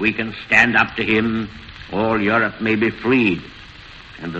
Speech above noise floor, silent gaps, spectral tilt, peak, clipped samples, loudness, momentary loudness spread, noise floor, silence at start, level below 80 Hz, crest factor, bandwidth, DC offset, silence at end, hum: 21 dB; none; -6 dB/octave; 0 dBFS; under 0.1%; -18 LUFS; 24 LU; -40 dBFS; 0 s; -46 dBFS; 20 dB; 8.2 kHz; under 0.1%; 0 s; none